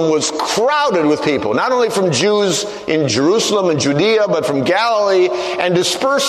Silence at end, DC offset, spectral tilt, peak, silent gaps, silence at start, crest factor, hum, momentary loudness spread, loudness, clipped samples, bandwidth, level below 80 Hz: 0 s; under 0.1%; -4 dB/octave; 0 dBFS; none; 0 s; 14 dB; none; 3 LU; -15 LUFS; under 0.1%; 13.5 kHz; -56 dBFS